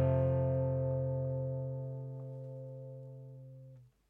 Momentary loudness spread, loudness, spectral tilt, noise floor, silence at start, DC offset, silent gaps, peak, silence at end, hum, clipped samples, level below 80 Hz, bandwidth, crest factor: 20 LU; -36 LUFS; -12 dB/octave; -56 dBFS; 0 s; under 0.1%; none; -20 dBFS; 0.2 s; none; under 0.1%; -64 dBFS; 3 kHz; 14 dB